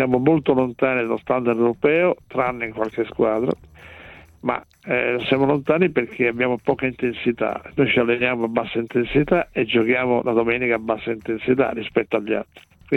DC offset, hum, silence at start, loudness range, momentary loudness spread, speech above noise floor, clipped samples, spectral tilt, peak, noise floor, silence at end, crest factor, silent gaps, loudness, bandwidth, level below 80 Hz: under 0.1%; none; 0 s; 3 LU; 8 LU; 22 dB; under 0.1%; -8 dB/octave; -4 dBFS; -43 dBFS; 0 s; 16 dB; none; -21 LUFS; 6.2 kHz; -50 dBFS